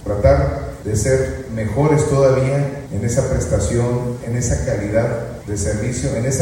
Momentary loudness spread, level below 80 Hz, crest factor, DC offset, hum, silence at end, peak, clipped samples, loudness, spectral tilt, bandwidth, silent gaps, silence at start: 9 LU; -30 dBFS; 16 dB; under 0.1%; none; 0 s; 0 dBFS; under 0.1%; -19 LUFS; -6.5 dB/octave; 16.5 kHz; none; 0 s